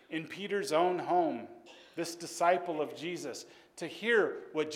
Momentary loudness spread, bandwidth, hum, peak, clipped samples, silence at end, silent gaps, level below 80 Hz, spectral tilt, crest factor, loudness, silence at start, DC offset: 16 LU; 16.5 kHz; none; -14 dBFS; under 0.1%; 0 s; none; -84 dBFS; -4 dB/octave; 20 dB; -33 LUFS; 0.1 s; under 0.1%